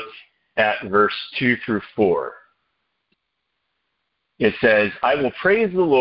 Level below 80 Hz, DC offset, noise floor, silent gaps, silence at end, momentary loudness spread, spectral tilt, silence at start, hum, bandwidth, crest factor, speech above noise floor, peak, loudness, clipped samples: -56 dBFS; under 0.1%; -76 dBFS; none; 0 s; 8 LU; -10 dB/octave; 0 s; none; 5.6 kHz; 18 dB; 57 dB; -4 dBFS; -19 LUFS; under 0.1%